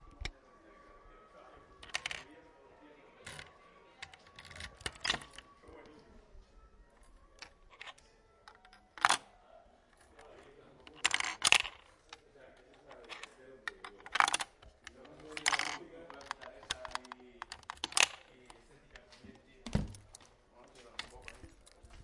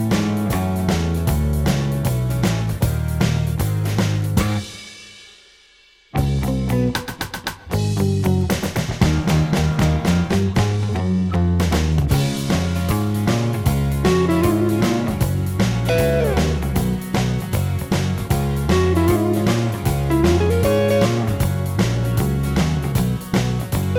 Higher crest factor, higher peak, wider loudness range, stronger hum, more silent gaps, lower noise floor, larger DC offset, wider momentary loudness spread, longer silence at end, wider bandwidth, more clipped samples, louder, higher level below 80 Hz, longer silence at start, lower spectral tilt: first, 36 dB vs 18 dB; second, -6 dBFS vs -2 dBFS; first, 13 LU vs 5 LU; neither; neither; first, -64 dBFS vs -52 dBFS; neither; first, 27 LU vs 5 LU; about the same, 0 s vs 0 s; second, 11.5 kHz vs 19 kHz; neither; second, -35 LUFS vs -19 LUFS; second, -58 dBFS vs -30 dBFS; about the same, 0 s vs 0 s; second, -1 dB/octave vs -6.5 dB/octave